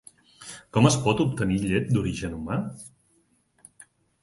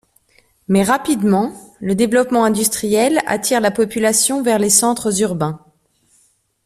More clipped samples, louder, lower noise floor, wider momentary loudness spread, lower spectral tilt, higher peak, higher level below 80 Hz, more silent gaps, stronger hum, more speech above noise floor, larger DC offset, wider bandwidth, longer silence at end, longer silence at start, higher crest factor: neither; second, -25 LUFS vs -16 LUFS; first, -66 dBFS vs -59 dBFS; first, 22 LU vs 9 LU; first, -5.5 dB/octave vs -4 dB/octave; second, -4 dBFS vs 0 dBFS; first, -48 dBFS vs -54 dBFS; neither; neither; about the same, 43 dB vs 43 dB; neither; second, 11.5 kHz vs 15 kHz; first, 1.35 s vs 1.1 s; second, 0.4 s vs 0.7 s; about the same, 22 dB vs 18 dB